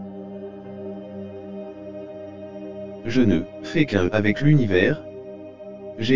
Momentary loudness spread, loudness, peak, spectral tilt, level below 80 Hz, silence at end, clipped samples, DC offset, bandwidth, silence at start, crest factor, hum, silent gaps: 19 LU; -21 LUFS; -2 dBFS; -7.5 dB/octave; -48 dBFS; 0 s; under 0.1%; under 0.1%; 7.6 kHz; 0 s; 20 dB; none; none